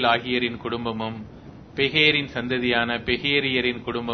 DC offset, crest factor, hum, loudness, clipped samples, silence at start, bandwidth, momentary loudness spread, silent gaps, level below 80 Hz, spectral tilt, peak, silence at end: under 0.1%; 20 dB; none; -22 LUFS; under 0.1%; 0 s; 6.4 kHz; 14 LU; none; -50 dBFS; -6 dB/octave; -4 dBFS; 0 s